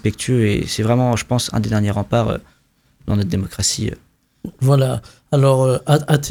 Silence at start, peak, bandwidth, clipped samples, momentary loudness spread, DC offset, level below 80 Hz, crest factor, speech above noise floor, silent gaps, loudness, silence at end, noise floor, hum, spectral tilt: 0.05 s; -2 dBFS; 16.5 kHz; under 0.1%; 12 LU; under 0.1%; -40 dBFS; 16 dB; 39 dB; none; -18 LUFS; 0 s; -56 dBFS; none; -5.5 dB/octave